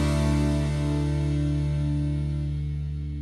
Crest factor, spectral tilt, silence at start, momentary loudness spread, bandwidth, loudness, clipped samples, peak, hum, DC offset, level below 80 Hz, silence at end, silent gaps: 10 dB; -7.5 dB/octave; 0 s; 7 LU; 11.5 kHz; -26 LUFS; under 0.1%; -14 dBFS; none; under 0.1%; -30 dBFS; 0 s; none